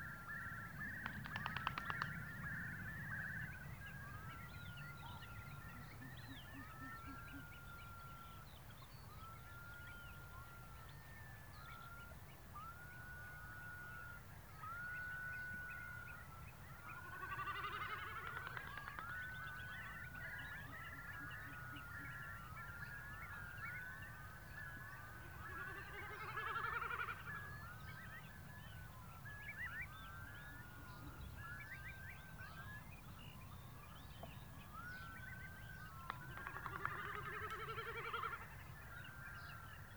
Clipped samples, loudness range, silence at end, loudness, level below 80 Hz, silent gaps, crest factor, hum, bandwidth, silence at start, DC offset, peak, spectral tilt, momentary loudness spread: under 0.1%; 8 LU; 0 s; -50 LUFS; -64 dBFS; none; 28 dB; none; over 20 kHz; 0 s; under 0.1%; -24 dBFS; -4.5 dB/octave; 10 LU